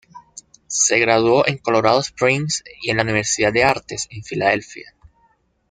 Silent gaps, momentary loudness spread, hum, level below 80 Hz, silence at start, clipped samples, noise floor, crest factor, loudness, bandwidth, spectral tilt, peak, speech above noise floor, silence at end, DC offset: none; 11 LU; none; -52 dBFS; 0.15 s; under 0.1%; -61 dBFS; 18 dB; -18 LUFS; 10 kHz; -3 dB/octave; -2 dBFS; 43 dB; 0.9 s; under 0.1%